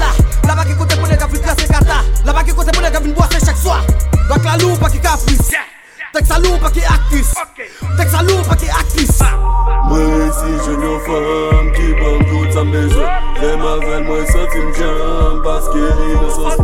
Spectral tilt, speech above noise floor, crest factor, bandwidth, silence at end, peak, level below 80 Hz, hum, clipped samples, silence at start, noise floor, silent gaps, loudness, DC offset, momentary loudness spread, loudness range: -5 dB/octave; 21 dB; 10 dB; 16.5 kHz; 0 s; 0 dBFS; -14 dBFS; none; under 0.1%; 0 s; -32 dBFS; none; -14 LUFS; 0.9%; 6 LU; 2 LU